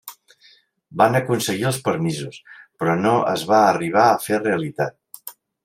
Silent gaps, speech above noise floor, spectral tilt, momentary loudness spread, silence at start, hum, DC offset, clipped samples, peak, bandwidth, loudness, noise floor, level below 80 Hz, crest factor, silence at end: none; 36 dB; -5 dB/octave; 20 LU; 0.05 s; none; under 0.1%; under 0.1%; -2 dBFS; 16 kHz; -19 LUFS; -55 dBFS; -64 dBFS; 20 dB; 0.35 s